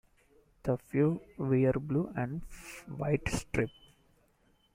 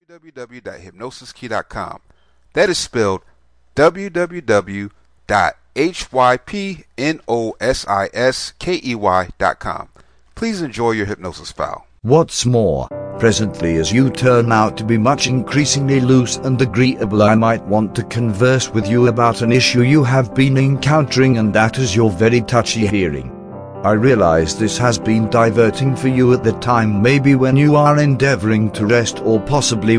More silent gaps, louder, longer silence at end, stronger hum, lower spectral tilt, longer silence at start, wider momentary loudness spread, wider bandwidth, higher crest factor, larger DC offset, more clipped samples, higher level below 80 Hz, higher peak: neither; second, -33 LUFS vs -15 LUFS; first, 1.05 s vs 0 s; neither; first, -7 dB/octave vs -5.5 dB/octave; first, 0.65 s vs 0.35 s; about the same, 13 LU vs 14 LU; first, 16 kHz vs 10.5 kHz; about the same, 18 dB vs 14 dB; neither; neither; second, -52 dBFS vs -42 dBFS; second, -16 dBFS vs 0 dBFS